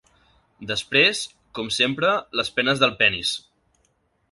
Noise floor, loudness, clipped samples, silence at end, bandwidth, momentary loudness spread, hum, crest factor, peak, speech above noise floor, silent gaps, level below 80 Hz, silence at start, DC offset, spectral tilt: -67 dBFS; -20 LUFS; under 0.1%; 0.95 s; 11.5 kHz; 15 LU; none; 22 dB; -2 dBFS; 45 dB; none; -58 dBFS; 0.6 s; under 0.1%; -3 dB/octave